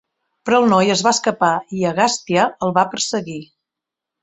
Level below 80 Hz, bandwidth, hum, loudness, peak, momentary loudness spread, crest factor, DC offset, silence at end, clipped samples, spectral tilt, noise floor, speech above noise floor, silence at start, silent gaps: -60 dBFS; 8.4 kHz; none; -17 LUFS; -2 dBFS; 10 LU; 18 dB; under 0.1%; 0.8 s; under 0.1%; -4 dB/octave; -85 dBFS; 68 dB; 0.45 s; none